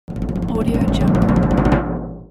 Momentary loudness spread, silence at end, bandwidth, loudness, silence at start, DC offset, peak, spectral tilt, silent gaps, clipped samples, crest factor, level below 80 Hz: 10 LU; 0.05 s; 12.5 kHz; -18 LUFS; 0.1 s; under 0.1%; -2 dBFS; -8.5 dB/octave; none; under 0.1%; 14 dB; -26 dBFS